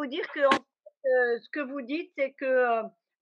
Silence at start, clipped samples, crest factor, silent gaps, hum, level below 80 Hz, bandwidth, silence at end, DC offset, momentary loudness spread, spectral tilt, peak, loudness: 0 s; under 0.1%; 22 dB; none; none; -82 dBFS; 8 kHz; 0.3 s; under 0.1%; 10 LU; -0.5 dB/octave; -6 dBFS; -28 LUFS